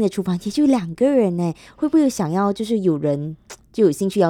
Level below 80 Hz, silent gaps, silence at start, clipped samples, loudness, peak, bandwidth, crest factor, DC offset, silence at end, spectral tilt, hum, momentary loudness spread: -56 dBFS; none; 0 s; under 0.1%; -20 LUFS; -4 dBFS; 16 kHz; 16 dB; under 0.1%; 0 s; -7 dB/octave; none; 9 LU